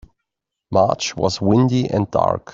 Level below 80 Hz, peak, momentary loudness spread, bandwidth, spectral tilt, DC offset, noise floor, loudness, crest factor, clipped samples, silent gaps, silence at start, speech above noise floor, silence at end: -50 dBFS; -2 dBFS; 5 LU; 7.6 kHz; -6 dB/octave; under 0.1%; -81 dBFS; -18 LUFS; 16 dB; under 0.1%; none; 0.7 s; 63 dB; 0.15 s